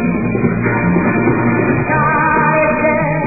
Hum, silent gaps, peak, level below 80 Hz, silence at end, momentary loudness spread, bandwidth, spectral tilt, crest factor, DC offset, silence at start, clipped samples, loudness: none; none; 0 dBFS; -36 dBFS; 0 s; 3 LU; 2.7 kHz; -15.5 dB/octave; 14 dB; 1%; 0 s; under 0.1%; -13 LUFS